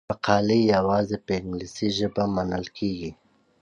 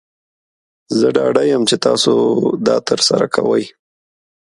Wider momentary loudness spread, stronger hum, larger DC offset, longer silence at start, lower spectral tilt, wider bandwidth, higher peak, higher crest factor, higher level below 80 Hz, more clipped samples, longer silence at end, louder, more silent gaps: first, 10 LU vs 4 LU; neither; neither; second, 0.1 s vs 0.9 s; first, -6 dB/octave vs -4 dB/octave; second, 9 kHz vs 11.5 kHz; second, -4 dBFS vs 0 dBFS; about the same, 20 dB vs 16 dB; first, -50 dBFS vs -58 dBFS; neither; second, 0.5 s vs 0.7 s; second, -25 LUFS vs -14 LUFS; neither